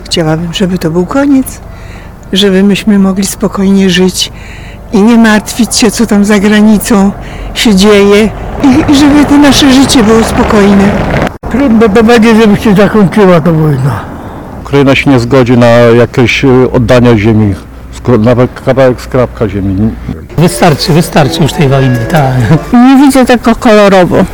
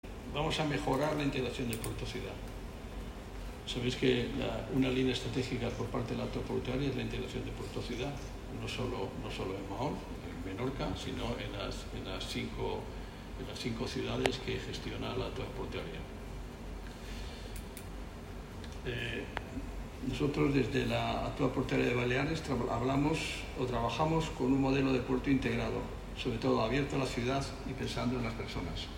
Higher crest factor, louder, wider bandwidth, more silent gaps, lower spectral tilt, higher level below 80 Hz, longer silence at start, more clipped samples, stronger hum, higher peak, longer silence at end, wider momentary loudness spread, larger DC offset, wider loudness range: second, 6 dB vs 24 dB; first, -6 LUFS vs -36 LUFS; first, 19 kHz vs 16 kHz; neither; about the same, -5.5 dB/octave vs -5.5 dB/octave; first, -24 dBFS vs -46 dBFS; about the same, 0 s vs 0.05 s; first, 8% vs under 0.1%; neither; first, 0 dBFS vs -12 dBFS; about the same, 0 s vs 0 s; second, 9 LU vs 14 LU; first, 0.8% vs under 0.1%; second, 4 LU vs 9 LU